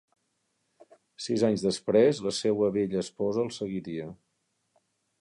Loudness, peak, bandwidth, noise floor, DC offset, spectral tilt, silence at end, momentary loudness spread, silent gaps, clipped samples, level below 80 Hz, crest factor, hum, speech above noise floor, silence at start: -28 LUFS; -10 dBFS; 11.5 kHz; -77 dBFS; under 0.1%; -5.5 dB/octave; 1.05 s; 14 LU; none; under 0.1%; -66 dBFS; 20 dB; none; 50 dB; 1.2 s